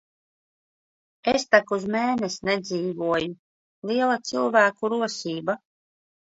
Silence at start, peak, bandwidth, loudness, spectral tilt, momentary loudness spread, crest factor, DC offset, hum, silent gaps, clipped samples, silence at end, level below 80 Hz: 1.25 s; -2 dBFS; 8 kHz; -24 LUFS; -4 dB/octave; 10 LU; 24 dB; under 0.1%; none; 3.39-3.82 s; under 0.1%; 0.75 s; -64 dBFS